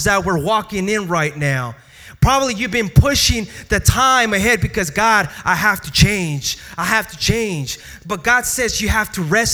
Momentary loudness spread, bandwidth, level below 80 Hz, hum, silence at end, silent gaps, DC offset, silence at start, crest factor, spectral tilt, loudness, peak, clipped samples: 8 LU; over 20 kHz; -30 dBFS; none; 0 s; none; under 0.1%; 0 s; 16 dB; -3.5 dB/octave; -16 LUFS; 0 dBFS; under 0.1%